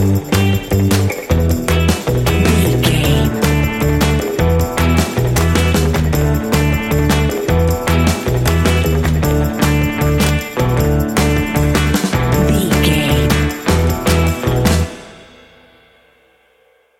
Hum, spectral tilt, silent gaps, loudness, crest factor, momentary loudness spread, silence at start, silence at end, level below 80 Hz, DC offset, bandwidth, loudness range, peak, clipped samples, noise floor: none; -5.5 dB/octave; none; -14 LUFS; 14 dB; 2 LU; 0 s; 1.75 s; -22 dBFS; under 0.1%; 17 kHz; 1 LU; 0 dBFS; under 0.1%; -54 dBFS